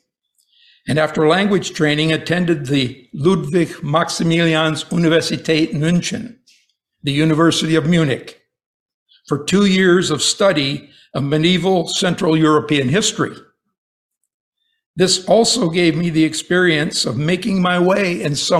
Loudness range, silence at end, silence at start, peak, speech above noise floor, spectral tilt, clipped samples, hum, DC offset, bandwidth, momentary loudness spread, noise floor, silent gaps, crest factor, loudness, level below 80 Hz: 3 LU; 0 s; 0.85 s; -2 dBFS; 50 dB; -4.5 dB/octave; under 0.1%; none; under 0.1%; 13.5 kHz; 8 LU; -66 dBFS; 8.66-9.06 s, 13.78-14.10 s, 14.34-14.52 s, 14.86-14.94 s; 16 dB; -16 LUFS; -50 dBFS